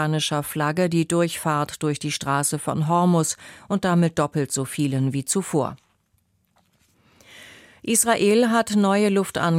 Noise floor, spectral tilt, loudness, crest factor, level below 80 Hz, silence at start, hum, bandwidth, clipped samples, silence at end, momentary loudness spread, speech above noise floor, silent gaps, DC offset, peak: -67 dBFS; -5 dB/octave; -22 LUFS; 18 dB; -60 dBFS; 0 s; none; 16 kHz; under 0.1%; 0 s; 7 LU; 45 dB; none; under 0.1%; -4 dBFS